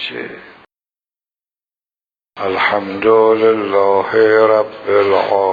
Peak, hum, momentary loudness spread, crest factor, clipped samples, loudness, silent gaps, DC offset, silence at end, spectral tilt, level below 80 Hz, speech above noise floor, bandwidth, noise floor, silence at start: 0 dBFS; none; 12 LU; 14 dB; under 0.1%; -13 LUFS; none; under 0.1%; 0 s; -7 dB/octave; -60 dBFS; over 77 dB; 5 kHz; under -90 dBFS; 0 s